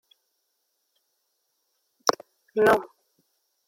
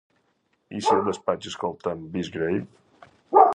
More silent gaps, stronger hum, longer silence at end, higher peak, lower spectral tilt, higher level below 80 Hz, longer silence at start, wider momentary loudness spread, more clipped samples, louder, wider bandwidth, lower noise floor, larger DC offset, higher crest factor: neither; neither; first, 0.8 s vs 0 s; about the same, -2 dBFS vs -2 dBFS; second, -3 dB/octave vs -5.5 dB/octave; second, -66 dBFS vs -60 dBFS; first, 2.05 s vs 0.7 s; about the same, 12 LU vs 10 LU; neither; about the same, -24 LUFS vs -25 LUFS; first, 16.5 kHz vs 10.5 kHz; first, -76 dBFS vs -70 dBFS; neither; first, 28 dB vs 22 dB